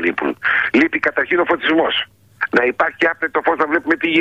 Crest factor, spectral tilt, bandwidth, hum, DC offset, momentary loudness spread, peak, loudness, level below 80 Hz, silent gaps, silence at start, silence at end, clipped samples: 14 dB; -5 dB/octave; 7.6 kHz; none; under 0.1%; 5 LU; -4 dBFS; -17 LUFS; -56 dBFS; none; 0 s; 0 s; under 0.1%